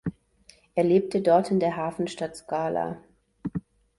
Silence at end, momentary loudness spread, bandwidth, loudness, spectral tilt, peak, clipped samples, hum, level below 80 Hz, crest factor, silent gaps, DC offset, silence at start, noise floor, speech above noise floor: 0.4 s; 15 LU; 11.5 kHz; -26 LUFS; -7 dB/octave; -8 dBFS; under 0.1%; none; -58 dBFS; 18 dB; none; under 0.1%; 0.05 s; -58 dBFS; 33 dB